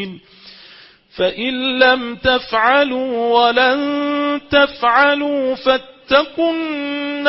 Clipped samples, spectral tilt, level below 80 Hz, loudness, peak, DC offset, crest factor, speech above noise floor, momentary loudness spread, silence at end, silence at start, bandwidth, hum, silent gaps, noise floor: under 0.1%; -7.5 dB/octave; -50 dBFS; -16 LUFS; 0 dBFS; under 0.1%; 16 dB; 28 dB; 7 LU; 0 s; 0 s; 5.8 kHz; none; none; -44 dBFS